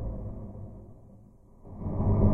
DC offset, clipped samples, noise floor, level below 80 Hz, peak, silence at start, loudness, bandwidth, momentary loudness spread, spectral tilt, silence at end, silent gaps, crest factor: under 0.1%; under 0.1%; -54 dBFS; -38 dBFS; -12 dBFS; 0 s; -33 LUFS; 2.4 kHz; 26 LU; -13.5 dB/octave; 0 s; none; 18 dB